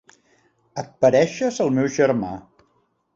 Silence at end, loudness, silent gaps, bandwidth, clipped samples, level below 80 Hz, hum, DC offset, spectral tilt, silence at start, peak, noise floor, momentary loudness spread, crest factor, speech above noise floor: 0.75 s; -20 LUFS; none; 7.8 kHz; under 0.1%; -58 dBFS; none; under 0.1%; -6 dB/octave; 0.75 s; -4 dBFS; -66 dBFS; 17 LU; 18 dB; 47 dB